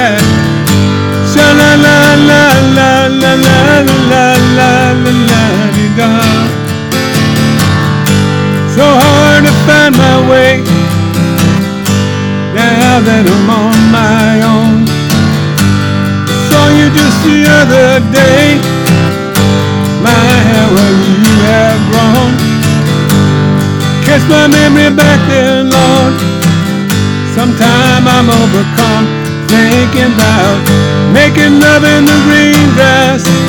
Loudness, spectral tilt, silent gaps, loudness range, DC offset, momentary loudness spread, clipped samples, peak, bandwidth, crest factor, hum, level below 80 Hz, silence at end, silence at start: -7 LUFS; -5 dB/octave; none; 3 LU; under 0.1%; 6 LU; 2%; 0 dBFS; 19.5 kHz; 6 dB; none; -34 dBFS; 0 s; 0 s